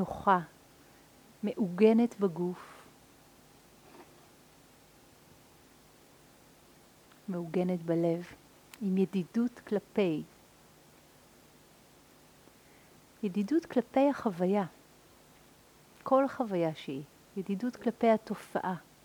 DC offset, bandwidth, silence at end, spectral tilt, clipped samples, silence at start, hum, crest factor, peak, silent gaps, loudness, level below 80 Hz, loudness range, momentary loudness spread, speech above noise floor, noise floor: under 0.1%; over 20 kHz; 0.25 s; -7.5 dB/octave; under 0.1%; 0 s; none; 22 dB; -12 dBFS; none; -31 LUFS; -70 dBFS; 9 LU; 14 LU; 29 dB; -60 dBFS